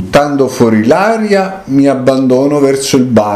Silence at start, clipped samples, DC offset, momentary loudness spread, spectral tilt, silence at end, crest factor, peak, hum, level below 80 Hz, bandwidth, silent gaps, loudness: 0 s; 0.7%; under 0.1%; 3 LU; -5.5 dB/octave; 0 s; 10 dB; 0 dBFS; none; -42 dBFS; 14 kHz; none; -10 LUFS